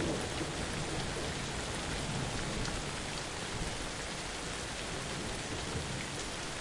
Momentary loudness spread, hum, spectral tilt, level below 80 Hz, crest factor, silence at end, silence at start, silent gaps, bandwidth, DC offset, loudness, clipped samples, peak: 2 LU; none; -3.5 dB/octave; -48 dBFS; 16 dB; 0 s; 0 s; none; 11.5 kHz; under 0.1%; -37 LUFS; under 0.1%; -22 dBFS